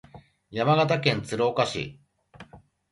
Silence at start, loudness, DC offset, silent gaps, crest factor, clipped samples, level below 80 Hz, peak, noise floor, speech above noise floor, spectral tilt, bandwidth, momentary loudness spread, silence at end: 0.15 s; -25 LUFS; under 0.1%; none; 22 dB; under 0.1%; -58 dBFS; -6 dBFS; -51 dBFS; 27 dB; -5.5 dB/octave; 11.5 kHz; 14 LU; 0.35 s